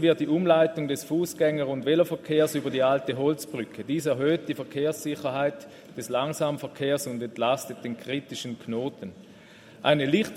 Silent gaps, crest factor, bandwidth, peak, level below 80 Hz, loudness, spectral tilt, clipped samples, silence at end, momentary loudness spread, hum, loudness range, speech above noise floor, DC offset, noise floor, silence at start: none; 20 dB; 16 kHz; -6 dBFS; -70 dBFS; -27 LUFS; -5.5 dB/octave; under 0.1%; 0 s; 12 LU; none; 5 LU; 24 dB; under 0.1%; -50 dBFS; 0 s